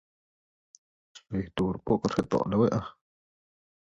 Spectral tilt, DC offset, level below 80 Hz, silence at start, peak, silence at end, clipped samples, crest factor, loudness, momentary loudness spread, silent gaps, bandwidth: -7.5 dB/octave; under 0.1%; -54 dBFS; 1.15 s; -10 dBFS; 1.05 s; under 0.1%; 20 dB; -29 LUFS; 10 LU; none; 11 kHz